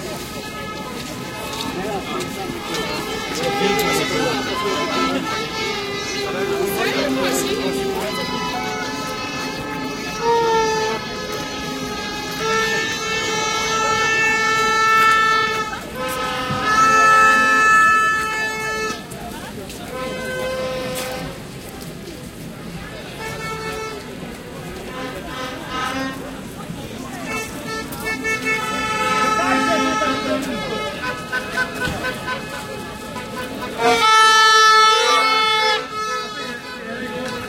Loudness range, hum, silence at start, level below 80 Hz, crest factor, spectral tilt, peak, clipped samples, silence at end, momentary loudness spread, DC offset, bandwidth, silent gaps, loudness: 14 LU; none; 0 s; -46 dBFS; 18 dB; -2.5 dB/octave; -2 dBFS; under 0.1%; 0 s; 18 LU; under 0.1%; 16.5 kHz; none; -19 LUFS